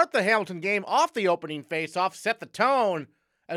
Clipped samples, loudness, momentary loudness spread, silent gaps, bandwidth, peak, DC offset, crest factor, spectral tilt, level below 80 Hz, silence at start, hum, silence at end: under 0.1%; -26 LUFS; 7 LU; none; 15 kHz; -8 dBFS; under 0.1%; 18 dB; -4 dB/octave; -84 dBFS; 0 s; none; 0 s